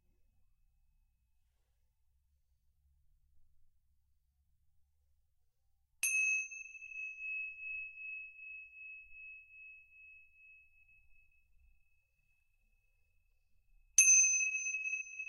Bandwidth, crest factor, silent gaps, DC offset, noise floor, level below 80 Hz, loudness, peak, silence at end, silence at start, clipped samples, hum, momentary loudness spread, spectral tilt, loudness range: 13 kHz; 30 dB; none; under 0.1%; -77 dBFS; -76 dBFS; -31 LUFS; -12 dBFS; 0 s; 6.05 s; under 0.1%; none; 26 LU; 5.5 dB/octave; 22 LU